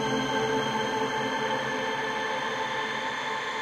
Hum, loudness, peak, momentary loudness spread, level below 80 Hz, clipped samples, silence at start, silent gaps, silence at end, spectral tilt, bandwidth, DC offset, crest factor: none; -28 LUFS; -16 dBFS; 3 LU; -62 dBFS; under 0.1%; 0 s; none; 0 s; -3.5 dB/octave; 13.5 kHz; under 0.1%; 14 dB